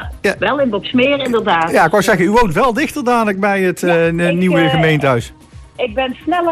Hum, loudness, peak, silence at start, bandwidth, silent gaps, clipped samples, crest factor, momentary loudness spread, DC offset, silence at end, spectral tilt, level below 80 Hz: none; -14 LUFS; -2 dBFS; 0 s; 14.5 kHz; none; under 0.1%; 12 dB; 7 LU; under 0.1%; 0 s; -5.5 dB/octave; -36 dBFS